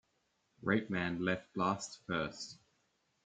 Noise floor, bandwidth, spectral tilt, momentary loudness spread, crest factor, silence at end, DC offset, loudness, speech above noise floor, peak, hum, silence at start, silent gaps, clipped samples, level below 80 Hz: -79 dBFS; 9.4 kHz; -5 dB/octave; 8 LU; 22 dB; 0.7 s; under 0.1%; -37 LUFS; 42 dB; -16 dBFS; none; 0.6 s; none; under 0.1%; -70 dBFS